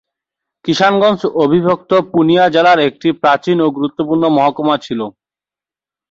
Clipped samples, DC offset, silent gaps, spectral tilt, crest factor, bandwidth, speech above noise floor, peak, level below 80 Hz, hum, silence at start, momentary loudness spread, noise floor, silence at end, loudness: under 0.1%; under 0.1%; none; -6 dB/octave; 12 dB; 7.6 kHz; 77 dB; -2 dBFS; -56 dBFS; 50 Hz at -55 dBFS; 0.65 s; 9 LU; -90 dBFS; 1 s; -13 LUFS